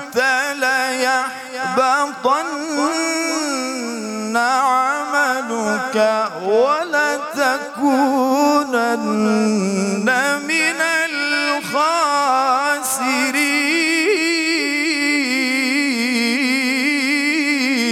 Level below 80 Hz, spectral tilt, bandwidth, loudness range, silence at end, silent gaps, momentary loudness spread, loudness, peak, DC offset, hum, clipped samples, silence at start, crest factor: -68 dBFS; -3 dB/octave; 17.5 kHz; 2 LU; 0 s; none; 4 LU; -17 LUFS; -4 dBFS; under 0.1%; none; under 0.1%; 0 s; 14 dB